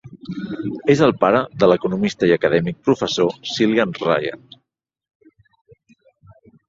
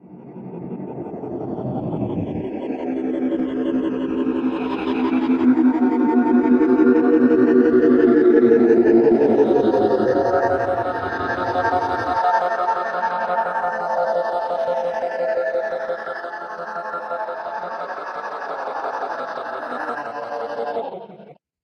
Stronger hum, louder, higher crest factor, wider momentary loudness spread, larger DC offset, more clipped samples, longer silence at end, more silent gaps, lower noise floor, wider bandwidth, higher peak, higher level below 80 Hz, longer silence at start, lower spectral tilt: neither; about the same, -18 LUFS vs -20 LUFS; about the same, 18 dB vs 16 dB; about the same, 12 LU vs 14 LU; neither; neither; first, 2.3 s vs 0.3 s; neither; first, -77 dBFS vs -45 dBFS; first, 7.8 kHz vs 6.6 kHz; about the same, -2 dBFS vs -2 dBFS; about the same, -56 dBFS vs -56 dBFS; about the same, 0.05 s vs 0.05 s; second, -6 dB/octave vs -8 dB/octave